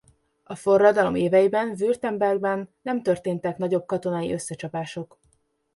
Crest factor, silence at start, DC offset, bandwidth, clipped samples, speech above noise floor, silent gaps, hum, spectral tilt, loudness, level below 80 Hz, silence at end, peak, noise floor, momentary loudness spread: 20 dB; 0.5 s; under 0.1%; 11.5 kHz; under 0.1%; 44 dB; none; none; -6 dB/octave; -23 LUFS; -62 dBFS; 0.7 s; -4 dBFS; -67 dBFS; 13 LU